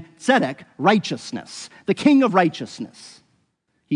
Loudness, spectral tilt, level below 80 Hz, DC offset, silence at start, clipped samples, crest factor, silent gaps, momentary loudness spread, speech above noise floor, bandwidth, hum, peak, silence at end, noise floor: -19 LUFS; -5.5 dB/octave; -72 dBFS; under 0.1%; 0 s; under 0.1%; 18 dB; none; 17 LU; 49 dB; 10.5 kHz; none; -4 dBFS; 0 s; -69 dBFS